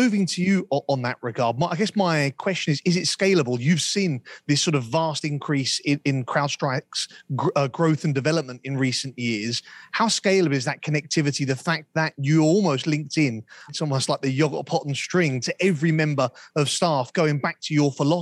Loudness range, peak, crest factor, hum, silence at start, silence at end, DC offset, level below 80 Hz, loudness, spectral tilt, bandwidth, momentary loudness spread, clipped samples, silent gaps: 2 LU; -8 dBFS; 14 dB; none; 0 s; 0 s; under 0.1%; -70 dBFS; -23 LUFS; -5 dB/octave; 12 kHz; 6 LU; under 0.1%; none